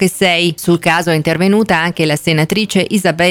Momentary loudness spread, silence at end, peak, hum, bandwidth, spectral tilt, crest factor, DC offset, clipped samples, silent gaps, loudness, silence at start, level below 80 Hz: 3 LU; 0 s; -2 dBFS; none; 17.5 kHz; -5 dB/octave; 12 dB; under 0.1%; under 0.1%; none; -13 LUFS; 0 s; -46 dBFS